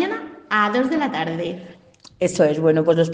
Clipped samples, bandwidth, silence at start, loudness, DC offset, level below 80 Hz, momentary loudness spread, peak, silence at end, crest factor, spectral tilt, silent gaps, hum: under 0.1%; 9.6 kHz; 0 s; -20 LUFS; under 0.1%; -62 dBFS; 12 LU; -4 dBFS; 0 s; 16 dB; -6 dB/octave; none; none